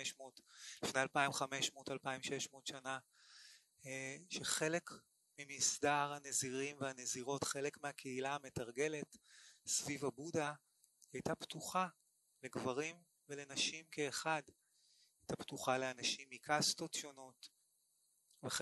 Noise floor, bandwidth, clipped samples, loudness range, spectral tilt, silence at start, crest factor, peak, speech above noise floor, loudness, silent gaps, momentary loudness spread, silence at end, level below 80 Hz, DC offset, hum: -79 dBFS; 12 kHz; under 0.1%; 4 LU; -2.5 dB/octave; 0 s; 24 dB; -20 dBFS; 37 dB; -41 LUFS; none; 19 LU; 0 s; -78 dBFS; under 0.1%; none